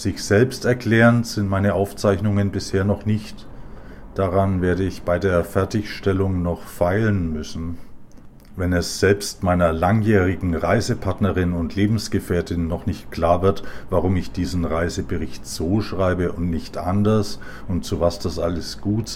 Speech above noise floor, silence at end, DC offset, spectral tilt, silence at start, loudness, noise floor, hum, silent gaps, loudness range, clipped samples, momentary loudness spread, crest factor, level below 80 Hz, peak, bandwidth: 21 dB; 0 s; under 0.1%; -6.5 dB/octave; 0 s; -21 LUFS; -41 dBFS; none; none; 3 LU; under 0.1%; 9 LU; 18 dB; -38 dBFS; -4 dBFS; 16 kHz